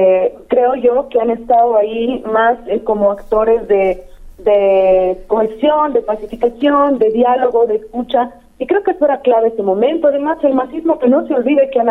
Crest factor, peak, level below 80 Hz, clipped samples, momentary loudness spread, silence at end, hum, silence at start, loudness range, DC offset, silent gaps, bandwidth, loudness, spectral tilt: 10 dB; -2 dBFS; -42 dBFS; under 0.1%; 6 LU; 0 s; none; 0 s; 1 LU; under 0.1%; none; 4.1 kHz; -14 LUFS; -7.5 dB/octave